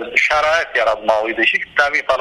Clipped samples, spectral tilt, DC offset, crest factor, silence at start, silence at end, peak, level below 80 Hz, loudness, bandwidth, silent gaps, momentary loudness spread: under 0.1%; -2 dB/octave; under 0.1%; 16 dB; 0 s; 0 s; 0 dBFS; -48 dBFS; -15 LUFS; 12.5 kHz; none; 3 LU